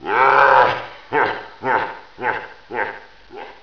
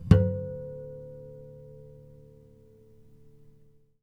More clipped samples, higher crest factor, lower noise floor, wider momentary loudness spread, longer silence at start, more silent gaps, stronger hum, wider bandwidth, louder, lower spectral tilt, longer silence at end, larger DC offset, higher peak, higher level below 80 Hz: neither; second, 20 dB vs 28 dB; second, -38 dBFS vs -58 dBFS; second, 17 LU vs 29 LU; about the same, 0 s vs 0 s; neither; neither; second, 5.4 kHz vs 6.2 kHz; first, -18 LUFS vs -29 LUFS; second, -5 dB/octave vs -9.5 dB/octave; second, 0.1 s vs 2.2 s; first, 0.4% vs under 0.1%; about the same, 0 dBFS vs -2 dBFS; second, -56 dBFS vs -44 dBFS